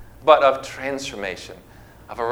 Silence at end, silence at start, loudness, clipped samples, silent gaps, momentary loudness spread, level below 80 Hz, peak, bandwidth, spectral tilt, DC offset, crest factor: 0 s; 0 s; -20 LUFS; under 0.1%; none; 21 LU; -50 dBFS; 0 dBFS; 16.5 kHz; -3.5 dB/octave; under 0.1%; 22 dB